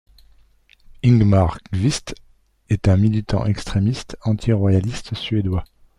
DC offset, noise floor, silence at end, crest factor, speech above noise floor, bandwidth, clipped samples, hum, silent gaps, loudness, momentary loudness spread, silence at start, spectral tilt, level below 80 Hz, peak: under 0.1%; -54 dBFS; 0.35 s; 16 dB; 35 dB; 11.5 kHz; under 0.1%; none; none; -20 LUFS; 11 LU; 1.05 s; -7 dB/octave; -38 dBFS; -4 dBFS